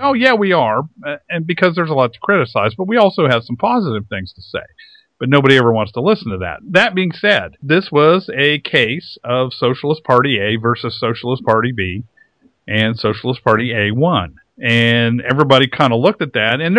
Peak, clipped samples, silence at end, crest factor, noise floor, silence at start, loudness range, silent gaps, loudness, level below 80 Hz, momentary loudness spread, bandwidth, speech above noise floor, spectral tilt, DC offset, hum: 0 dBFS; 0.1%; 0 s; 16 dB; -53 dBFS; 0 s; 3 LU; none; -15 LUFS; -52 dBFS; 11 LU; 11 kHz; 39 dB; -7 dB/octave; under 0.1%; none